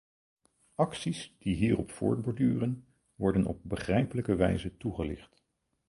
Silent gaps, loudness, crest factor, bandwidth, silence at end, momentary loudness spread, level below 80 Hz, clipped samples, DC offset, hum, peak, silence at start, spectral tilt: none; -31 LUFS; 20 dB; 11.5 kHz; 0.65 s; 8 LU; -50 dBFS; under 0.1%; under 0.1%; none; -12 dBFS; 0.8 s; -7 dB/octave